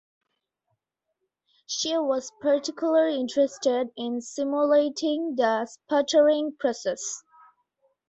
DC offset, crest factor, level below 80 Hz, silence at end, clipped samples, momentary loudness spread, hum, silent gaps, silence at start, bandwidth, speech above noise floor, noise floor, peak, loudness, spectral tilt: under 0.1%; 16 dB; -74 dBFS; 0.9 s; under 0.1%; 9 LU; none; none; 1.7 s; 8.2 kHz; 56 dB; -81 dBFS; -10 dBFS; -25 LUFS; -2.5 dB/octave